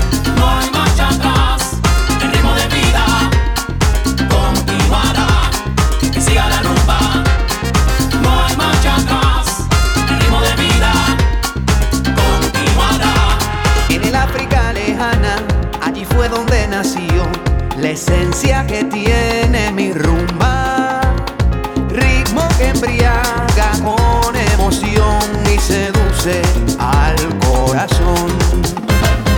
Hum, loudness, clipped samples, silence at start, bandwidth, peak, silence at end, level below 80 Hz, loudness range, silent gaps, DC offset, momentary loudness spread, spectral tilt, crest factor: none; -14 LUFS; under 0.1%; 0 s; 20 kHz; -2 dBFS; 0 s; -16 dBFS; 2 LU; none; under 0.1%; 4 LU; -4.5 dB/octave; 12 dB